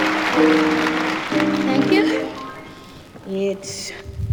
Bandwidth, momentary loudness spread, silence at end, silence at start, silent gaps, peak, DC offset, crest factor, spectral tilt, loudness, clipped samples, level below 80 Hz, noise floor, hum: over 20 kHz; 19 LU; 0 s; 0 s; none; -2 dBFS; under 0.1%; 18 dB; -5 dB/octave; -19 LUFS; under 0.1%; -46 dBFS; -40 dBFS; none